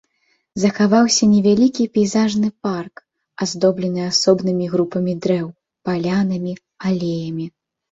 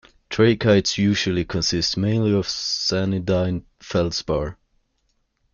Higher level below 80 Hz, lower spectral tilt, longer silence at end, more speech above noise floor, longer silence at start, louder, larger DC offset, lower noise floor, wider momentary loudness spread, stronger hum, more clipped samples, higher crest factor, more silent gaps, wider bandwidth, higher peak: second, -58 dBFS vs -46 dBFS; about the same, -5 dB/octave vs -5 dB/octave; second, 0.4 s vs 1 s; about the same, 48 dB vs 48 dB; first, 0.55 s vs 0.3 s; first, -18 LUFS vs -21 LUFS; neither; second, -65 dBFS vs -69 dBFS; first, 14 LU vs 8 LU; neither; neither; about the same, 16 dB vs 18 dB; neither; first, 8 kHz vs 7.2 kHz; about the same, -2 dBFS vs -4 dBFS